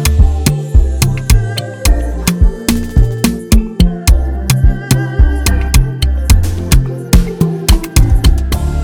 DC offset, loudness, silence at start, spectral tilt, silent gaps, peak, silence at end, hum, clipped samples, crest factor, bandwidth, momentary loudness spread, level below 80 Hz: under 0.1%; -13 LUFS; 0 s; -5 dB/octave; none; 0 dBFS; 0 s; none; 1%; 10 dB; 19.5 kHz; 4 LU; -12 dBFS